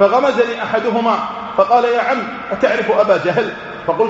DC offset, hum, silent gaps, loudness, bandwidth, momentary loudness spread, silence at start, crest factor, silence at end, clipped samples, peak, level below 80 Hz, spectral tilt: under 0.1%; none; none; -16 LUFS; 7.8 kHz; 8 LU; 0 s; 14 dB; 0 s; under 0.1%; 0 dBFS; -54 dBFS; -3 dB/octave